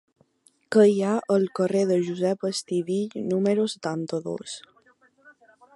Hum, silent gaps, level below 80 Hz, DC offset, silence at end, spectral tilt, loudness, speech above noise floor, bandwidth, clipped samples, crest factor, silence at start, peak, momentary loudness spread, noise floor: none; none; -74 dBFS; under 0.1%; 1.15 s; -6 dB/octave; -24 LUFS; 40 dB; 11.5 kHz; under 0.1%; 18 dB; 0.7 s; -6 dBFS; 12 LU; -64 dBFS